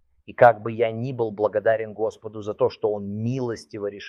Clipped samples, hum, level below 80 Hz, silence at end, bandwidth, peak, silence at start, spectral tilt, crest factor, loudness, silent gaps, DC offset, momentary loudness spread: under 0.1%; none; -66 dBFS; 0 s; 11 kHz; -2 dBFS; 0.3 s; -7.5 dB/octave; 22 dB; -24 LUFS; none; under 0.1%; 14 LU